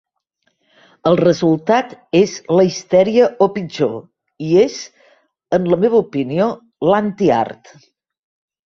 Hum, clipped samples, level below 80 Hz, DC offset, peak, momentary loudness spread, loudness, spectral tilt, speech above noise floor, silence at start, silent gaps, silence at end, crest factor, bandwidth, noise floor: none; under 0.1%; -56 dBFS; under 0.1%; 0 dBFS; 7 LU; -16 LUFS; -6.5 dB/octave; 52 dB; 1.05 s; none; 1.1 s; 16 dB; 7.6 kHz; -67 dBFS